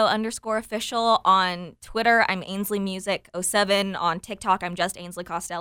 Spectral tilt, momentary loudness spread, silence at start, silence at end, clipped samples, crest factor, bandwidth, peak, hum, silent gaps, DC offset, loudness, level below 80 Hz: -3 dB/octave; 11 LU; 0 s; 0 s; under 0.1%; 18 dB; 18.5 kHz; -6 dBFS; none; none; under 0.1%; -24 LUFS; -56 dBFS